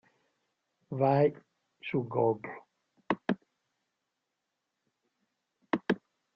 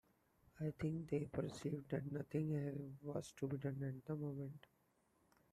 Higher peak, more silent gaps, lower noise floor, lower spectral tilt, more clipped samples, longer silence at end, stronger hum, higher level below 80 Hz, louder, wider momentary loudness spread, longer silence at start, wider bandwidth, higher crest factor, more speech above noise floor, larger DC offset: first, -12 dBFS vs -28 dBFS; neither; first, -85 dBFS vs -79 dBFS; second, -6 dB/octave vs -8 dB/octave; neither; second, 0.4 s vs 0.95 s; neither; about the same, -74 dBFS vs -72 dBFS; first, -31 LUFS vs -46 LUFS; first, 16 LU vs 6 LU; first, 0.9 s vs 0.55 s; second, 6.6 kHz vs 13.5 kHz; about the same, 22 dB vs 18 dB; first, 56 dB vs 35 dB; neither